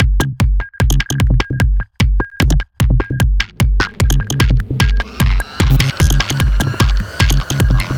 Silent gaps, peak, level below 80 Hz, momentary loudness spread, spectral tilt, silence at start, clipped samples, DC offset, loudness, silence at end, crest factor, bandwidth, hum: none; 0 dBFS; -16 dBFS; 3 LU; -5 dB/octave; 0 s; under 0.1%; under 0.1%; -15 LUFS; 0 s; 12 dB; 17 kHz; none